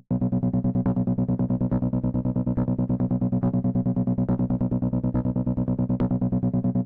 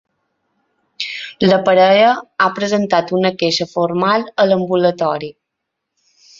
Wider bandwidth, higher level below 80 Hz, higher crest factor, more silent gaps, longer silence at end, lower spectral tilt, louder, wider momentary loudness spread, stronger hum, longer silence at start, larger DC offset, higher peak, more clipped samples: second, 2.5 kHz vs 7.8 kHz; first, -40 dBFS vs -58 dBFS; second, 8 dB vs 16 dB; neither; second, 0 s vs 1.1 s; first, -14 dB/octave vs -5.5 dB/octave; second, -25 LUFS vs -15 LUFS; second, 2 LU vs 13 LU; first, 60 Hz at -45 dBFS vs none; second, 0.1 s vs 1 s; neither; second, -16 dBFS vs 0 dBFS; neither